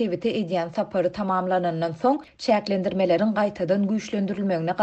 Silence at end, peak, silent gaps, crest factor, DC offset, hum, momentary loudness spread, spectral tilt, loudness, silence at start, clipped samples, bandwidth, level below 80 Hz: 0 s; -8 dBFS; none; 16 dB; under 0.1%; none; 5 LU; -7 dB/octave; -24 LUFS; 0 s; under 0.1%; 8.4 kHz; -60 dBFS